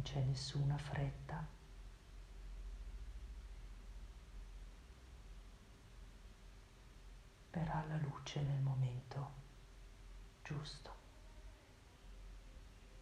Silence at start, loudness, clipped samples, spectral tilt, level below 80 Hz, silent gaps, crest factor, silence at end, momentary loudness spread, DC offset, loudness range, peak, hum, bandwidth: 0 s; -45 LUFS; under 0.1%; -6 dB/octave; -56 dBFS; none; 18 dB; 0 s; 21 LU; under 0.1%; 15 LU; -30 dBFS; none; 10.5 kHz